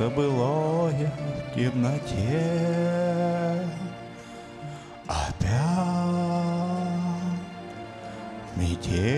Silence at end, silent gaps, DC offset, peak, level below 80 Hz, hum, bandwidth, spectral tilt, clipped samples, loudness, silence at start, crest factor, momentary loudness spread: 0 s; none; under 0.1%; -12 dBFS; -46 dBFS; none; 11 kHz; -7 dB/octave; under 0.1%; -27 LUFS; 0 s; 14 dB; 15 LU